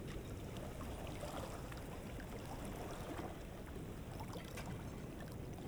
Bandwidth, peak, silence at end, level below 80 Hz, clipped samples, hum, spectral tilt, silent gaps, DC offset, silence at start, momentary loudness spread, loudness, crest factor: over 20 kHz; -32 dBFS; 0 s; -54 dBFS; under 0.1%; none; -5.5 dB/octave; none; under 0.1%; 0 s; 3 LU; -48 LUFS; 14 dB